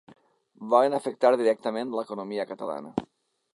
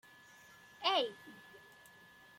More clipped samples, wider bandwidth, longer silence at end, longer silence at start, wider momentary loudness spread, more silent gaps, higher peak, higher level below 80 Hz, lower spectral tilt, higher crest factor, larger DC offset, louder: neither; second, 11.5 kHz vs 16.5 kHz; second, 0.5 s vs 0.8 s; second, 0.6 s vs 0.8 s; second, 13 LU vs 25 LU; neither; first, -6 dBFS vs -20 dBFS; first, -70 dBFS vs -86 dBFS; first, -5.5 dB/octave vs -2 dB/octave; about the same, 22 dB vs 24 dB; neither; first, -26 LUFS vs -35 LUFS